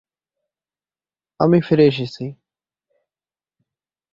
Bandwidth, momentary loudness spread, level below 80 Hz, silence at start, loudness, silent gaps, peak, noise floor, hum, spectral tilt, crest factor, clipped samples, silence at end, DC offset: 7.4 kHz; 17 LU; -60 dBFS; 1.4 s; -17 LUFS; none; -2 dBFS; under -90 dBFS; none; -8.5 dB/octave; 20 dB; under 0.1%; 1.8 s; under 0.1%